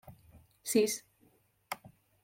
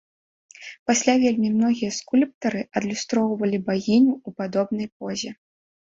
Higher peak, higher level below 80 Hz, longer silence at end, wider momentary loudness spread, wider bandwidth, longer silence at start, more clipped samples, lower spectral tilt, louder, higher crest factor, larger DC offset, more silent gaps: second, -16 dBFS vs -4 dBFS; second, -72 dBFS vs -64 dBFS; second, 0.35 s vs 0.6 s; first, 15 LU vs 11 LU; first, 16.5 kHz vs 8 kHz; second, 0.1 s vs 0.6 s; neither; second, -3 dB/octave vs -4.5 dB/octave; second, -34 LUFS vs -23 LUFS; about the same, 22 dB vs 20 dB; neither; second, none vs 0.79-0.86 s, 2.34-2.41 s, 4.92-5.00 s